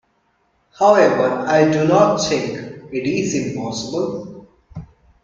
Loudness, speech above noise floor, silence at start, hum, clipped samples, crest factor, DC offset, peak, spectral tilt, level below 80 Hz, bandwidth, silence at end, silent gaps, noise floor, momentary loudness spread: -17 LUFS; 47 dB; 0.8 s; none; under 0.1%; 18 dB; under 0.1%; 0 dBFS; -5 dB/octave; -54 dBFS; 7.6 kHz; 0.4 s; none; -63 dBFS; 23 LU